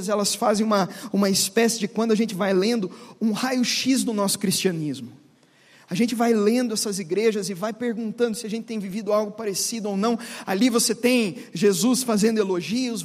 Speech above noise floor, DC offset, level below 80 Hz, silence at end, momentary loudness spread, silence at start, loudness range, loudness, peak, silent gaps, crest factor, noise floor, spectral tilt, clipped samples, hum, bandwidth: 33 dB; under 0.1%; -70 dBFS; 0 s; 9 LU; 0 s; 3 LU; -23 LUFS; -6 dBFS; none; 16 dB; -56 dBFS; -4 dB/octave; under 0.1%; none; 15.5 kHz